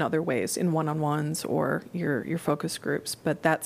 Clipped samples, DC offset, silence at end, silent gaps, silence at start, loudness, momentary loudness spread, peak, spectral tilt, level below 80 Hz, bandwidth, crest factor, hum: under 0.1%; under 0.1%; 0 s; none; 0 s; -28 LUFS; 3 LU; -8 dBFS; -5.5 dB/octave; -68 dBFS; 15.5 kHz; 20 dB; none